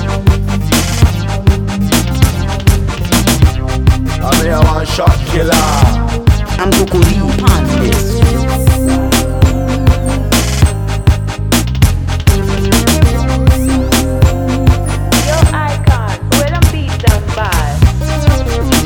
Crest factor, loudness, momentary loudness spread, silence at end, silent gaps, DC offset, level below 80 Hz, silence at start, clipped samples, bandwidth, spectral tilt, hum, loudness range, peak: 10 dB; -12 LUFS; 3 LU; 0 s; none; under 0.1%; -16 dBFS; 0 s; 1%; 19 kHz; -5 dB/octave; none; 1 LU; 0 dBFS